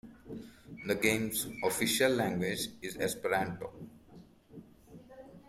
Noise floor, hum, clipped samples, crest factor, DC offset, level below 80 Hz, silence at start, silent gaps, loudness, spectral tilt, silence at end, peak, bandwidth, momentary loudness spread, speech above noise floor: -57 dBFS; none; under 0.1%; 22 dB; under 0.1%; -64 dBFS; 0.05 s; none; -32 LUFS; -3.5 dB/octave; 0.1 s; -14 dBFS; 16 kHz; 23 LU; 24 dB